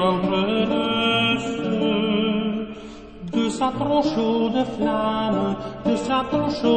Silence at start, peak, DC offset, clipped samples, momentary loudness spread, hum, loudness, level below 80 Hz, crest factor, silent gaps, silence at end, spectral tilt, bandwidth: 0 s; -6 dBFS; 0.1%; under 0.1%; 7 LU; none; -22 LUFS; -48 dBFS; 14 dB; none; 0 s; -5.5 dB/octave; 8.8 kHz